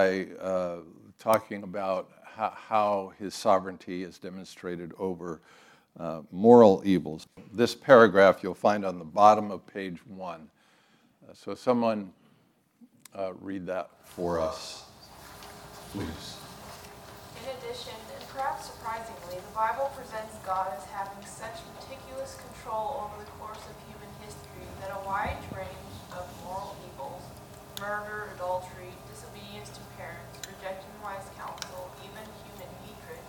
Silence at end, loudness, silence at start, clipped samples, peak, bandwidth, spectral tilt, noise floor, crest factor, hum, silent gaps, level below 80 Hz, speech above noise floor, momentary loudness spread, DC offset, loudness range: 0 s; -28 LUFS; 0 s; under 0.1%; -2 dBFS; 18 kHz; -5.5 dB/octave; -65 dBFS; 26 dB; none; none; -60 dBFS; 38 dB; 21 LU; under 0.1%; 17 LU